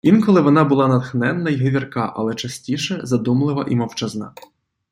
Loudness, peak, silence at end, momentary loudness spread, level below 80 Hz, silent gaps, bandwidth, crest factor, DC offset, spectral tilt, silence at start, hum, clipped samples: -18 LUFS; -2 dBFS; 0.65 s; 12 LU; -58 dBFS; none; 15 kHz; 16 dB; under 0.1%; -6.5 dB/octave; 0.05 s; none; under 0.1%